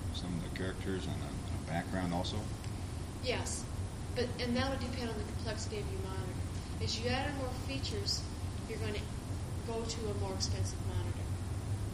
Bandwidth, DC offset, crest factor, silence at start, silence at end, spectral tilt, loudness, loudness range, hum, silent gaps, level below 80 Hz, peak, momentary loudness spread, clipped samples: 15 kHz; under 0.1%; 18 dB; 0 s; 0 s; -5 dB/octave; -38 LUFS; 1 LU; none; none; -46 dBFS; -20 dBFS; 6 LU; under 0.1%